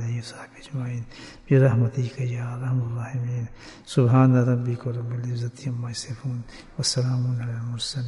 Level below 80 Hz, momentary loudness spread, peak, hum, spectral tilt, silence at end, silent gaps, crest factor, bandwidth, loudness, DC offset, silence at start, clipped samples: -54 dBFS; 17 LU; -6 dBFS; none; -6.5 dB/octave; 0 s; none; 18 dB; 11.5 kHz; -25 LUFS; under 0.1%; 0 s; under 0.1%